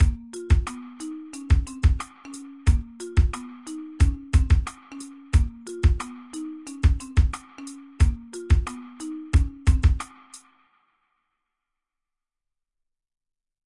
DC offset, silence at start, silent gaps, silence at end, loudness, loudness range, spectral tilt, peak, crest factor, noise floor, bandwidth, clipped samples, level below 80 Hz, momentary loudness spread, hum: under 0.1%; 0 s; none; 3.3 s; -25 LUFS; 3 LU; -6.5 dB/octave; -8 dBFS; 16 dB; -85 dBFS; 11.5 kHz; under 0.1%; -26 dBFS; 16 LU; none